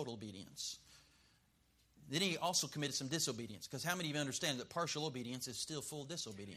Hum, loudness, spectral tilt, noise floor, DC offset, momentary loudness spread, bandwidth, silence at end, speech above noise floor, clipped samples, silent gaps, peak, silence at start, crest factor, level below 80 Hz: none; -40 LUFS; -3 dB/octave; -74 dBFS; under 0.1%; 10 LU; 15 kHz; 0 s; 32 dB; under 0.1%; none; -20 dBFS; 0 s; 22 dB; -76 dBFS